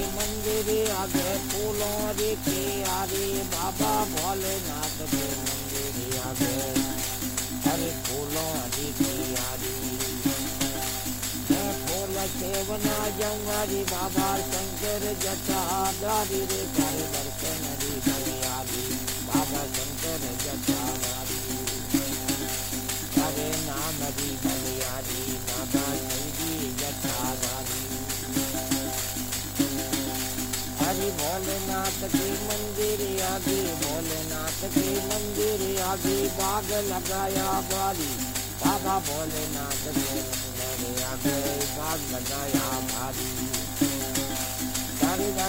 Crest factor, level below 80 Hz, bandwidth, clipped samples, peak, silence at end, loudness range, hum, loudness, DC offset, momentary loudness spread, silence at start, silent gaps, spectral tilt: 22 dB; -44 dBFS; 16.5 kHz; under 0.1%; -6 dBFS; 0 s; 1 LU; 50 Hz at -40 dBFS; -27 LUFS; under 0.1%; 3 LU; 0 s; none; -3 dB/octave